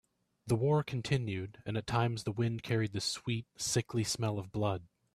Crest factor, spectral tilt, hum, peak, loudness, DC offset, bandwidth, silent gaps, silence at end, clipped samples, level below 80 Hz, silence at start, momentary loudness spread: 18 dB; -5 dB/octave; none; -16 dBFS; -34 LUFS; under 0.1%; 14 kHz; none; 0.3 s; under 0.1%; -62 dBFS; 0.45 s; 8 LU